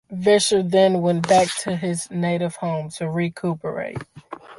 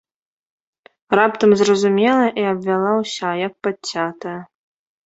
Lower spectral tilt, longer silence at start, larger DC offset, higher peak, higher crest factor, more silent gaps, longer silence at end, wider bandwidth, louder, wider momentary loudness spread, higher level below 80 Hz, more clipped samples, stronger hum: about the same, -5 dB/octave vs -5 dB/octave; second, 0.1 s vs 1.1 s; neither; about the same, -4 dBFS vs -2 dBFS; about the same, 18 dB vs 18 dB; neither; second, 0.05 s vs 0.6 s; first, 11.5 kHz vs 8 kHz; second, -21 LUFS vs -18 LUFS; first, 13 LU vs 10 LU; first, -58 dBFS vs -64 dBFS; neither; neither